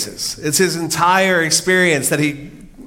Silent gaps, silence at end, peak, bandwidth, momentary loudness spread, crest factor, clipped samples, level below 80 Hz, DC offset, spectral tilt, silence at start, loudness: none; 0 s; -2 dBFS; 17 kHz; 9 LU; 16 dB; under 0.1%; -48 dBFS; under 0.1%; -3 dB/octave; 0 s; -15 LUFS